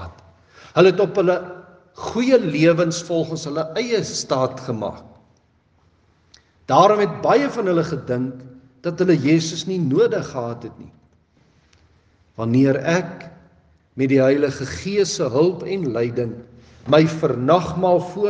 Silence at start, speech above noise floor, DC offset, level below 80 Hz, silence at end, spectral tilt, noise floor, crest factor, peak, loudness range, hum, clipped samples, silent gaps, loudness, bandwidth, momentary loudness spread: 0 s; 41 dB; under 0.1%; -58 dBFS; 0 s; -6 dB/octave; -60 dBFS; 20 dB; 0 dBFS; 5 LU; none; under 0.1%; none; -19 LUFS; 9.6 kHz; 14 LU